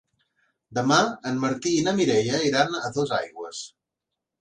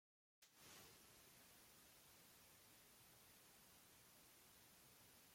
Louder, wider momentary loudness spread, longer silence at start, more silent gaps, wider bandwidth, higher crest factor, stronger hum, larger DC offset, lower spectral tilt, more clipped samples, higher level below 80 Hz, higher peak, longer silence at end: first, -24 LUFS vs -67 LUFS; first, 14 LU vs 3 LU; first, 0.7 s vs 0.4 s; neither; second, 10 kHz vs 16.5 kHz; about the same, 18 dB vs 18 dB; neither; neither; first, -4 dB/octave vs -1.5 dB/octave; neither; first, -64 dBFS vs -88 dBFS; first, -6 dBFS vs -52 dBFS; first, 0.75 s vs 0 s